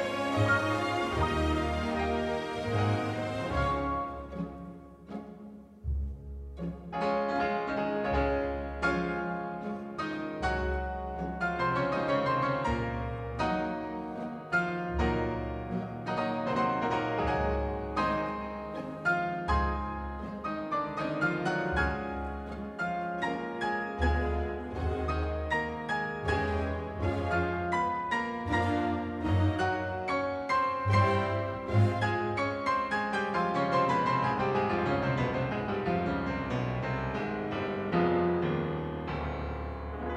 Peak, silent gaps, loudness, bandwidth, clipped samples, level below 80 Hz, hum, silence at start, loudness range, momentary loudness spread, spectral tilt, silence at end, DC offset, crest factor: -14 dBFS; none; -31 LUFS; 11.5 kHz; under 0.1%; -42 dBFS; none; 0 s; 4 LU; 10 LU; -7 dB/octave; 0 s; under 0.1%; 18 dB